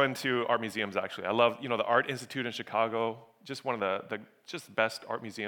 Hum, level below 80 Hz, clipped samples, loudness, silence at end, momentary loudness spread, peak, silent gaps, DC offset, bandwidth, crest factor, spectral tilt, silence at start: none; -86 dBFS; under 0.1%; -31 LUFS; 0 s; 14 LU; -10 dBFS; none; under 0.1%; 19 kHz; 22 dB; -4.5 dB/octave; 0 s